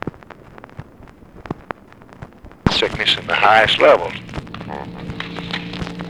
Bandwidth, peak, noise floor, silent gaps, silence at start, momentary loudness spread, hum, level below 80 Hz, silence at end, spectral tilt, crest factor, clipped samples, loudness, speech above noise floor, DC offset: 13.5 kHz; 0 dBFS; -43 dBFS; none; 0.05 s; 22 LU; none; -42 dBFS; 0 s; -4.5 dB/octave; 20 dB; under 0.1%; -16 LUFS; 28 dB; 0.1%